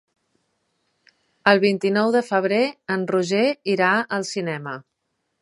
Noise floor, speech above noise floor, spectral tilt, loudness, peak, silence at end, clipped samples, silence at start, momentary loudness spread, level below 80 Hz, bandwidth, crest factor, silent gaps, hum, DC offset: -75 dBFS; 55 dB; -5 dB/octave; -21 LUFS; -2 dBFS; 0.6 s; under 0.1%; 1.45 s; 10 LU; -72 dBFS; 11.5 kHz; 22 dB; none; none; under 0.1%